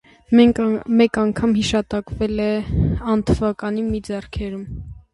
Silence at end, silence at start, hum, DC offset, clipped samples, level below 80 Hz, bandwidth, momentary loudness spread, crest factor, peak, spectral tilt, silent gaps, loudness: 0.15 s; 0.3 s; none; under 0.1%; under 0.1%; -34 dBFS; 11 kHz; 13 LU; 16 dB; -2 dBFS; -6.5 dB/octave; none; -19 LUFS